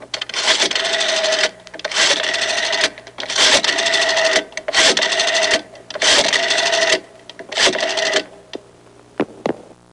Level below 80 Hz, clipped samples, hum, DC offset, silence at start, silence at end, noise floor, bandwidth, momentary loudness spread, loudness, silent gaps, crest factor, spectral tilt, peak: -56 dBFS; under 0.1%; none; under 0.1%; 0 s; 0.3 s; -46 dBFS; 11.5 kHz; 14 LU; -15 LUFS; none; 16 dB; 0 dB/octave; -2 dBFS